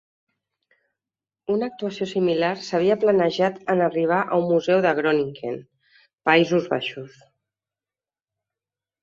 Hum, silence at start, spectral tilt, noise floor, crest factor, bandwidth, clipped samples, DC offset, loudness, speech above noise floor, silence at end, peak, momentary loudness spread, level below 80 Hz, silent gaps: none; 1.5 s; -6 dB/octave; under -90 dBFS; 20 dB; 7.6 kHz; under 0.1%; under 0.1%; -22 LUFS; over 69 dB; 1.95 s; -2 dBFS; 11 LU; -68 dBFS; none